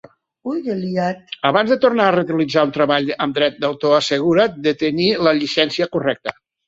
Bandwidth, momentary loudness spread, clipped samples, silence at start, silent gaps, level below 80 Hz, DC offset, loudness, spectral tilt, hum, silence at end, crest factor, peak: 8 kHz; 8 LU; under 0.1%; 0.45 s; none; -58 dBFS; under 0.1%; -18 LUFS; -5.5 dB/octave; none; 0.35 s; 16 dB; -2 dBFS